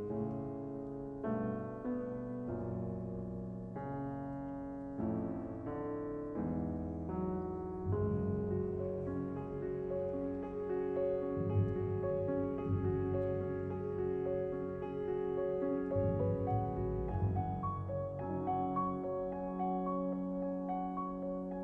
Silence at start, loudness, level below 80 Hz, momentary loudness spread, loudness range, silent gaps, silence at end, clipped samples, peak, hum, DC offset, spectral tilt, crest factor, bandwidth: 0 s; -38 LUFS; -54 dBFS; 7 LU; 5 LU; none; 0 s; under 0.1%; -22 dBFS; none; under 0.1%; -11.5 dB/octave; 16 dB; 3.6 kHz